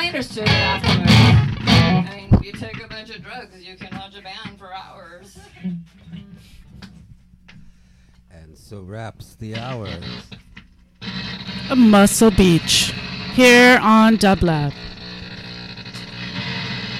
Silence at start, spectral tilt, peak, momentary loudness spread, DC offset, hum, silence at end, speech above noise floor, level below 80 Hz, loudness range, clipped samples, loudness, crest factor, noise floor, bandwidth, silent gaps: 0 s; -5 dB/octave; -4 dBFS; 23 LU; under 0.1%; none; 0 s; 33 dB; -36 dBFS; 23 LU; under 0.1%; -15 LUFS; 14 dB; -50 dBFS; 16 kHz; none